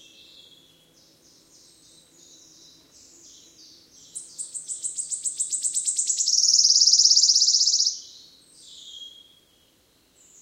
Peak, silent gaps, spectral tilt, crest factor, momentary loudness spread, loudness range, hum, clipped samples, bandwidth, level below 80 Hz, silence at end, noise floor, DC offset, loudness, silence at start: -4 dBFS; none; 4 dB/octave; 22 dB; 25 LU; 17 LU; none; under 0.1%; 16 kHz; -76 dBFS; 1.3 s; -62 dBFS; under 0.1%; -18 LUFS; 4.15 s